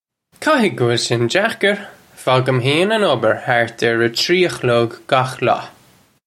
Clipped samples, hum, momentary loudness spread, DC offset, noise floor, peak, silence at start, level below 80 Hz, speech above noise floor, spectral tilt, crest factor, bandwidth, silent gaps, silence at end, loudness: under 0.1%; none; 4 LU; under 0.1%; -52 dBFS; 0 dBFS; 0.4 s; -60 dBFS; 36 dB; -5 dB/octave; 16 dB; 14.5 kHz; none; 0.55 s; -16 LUFS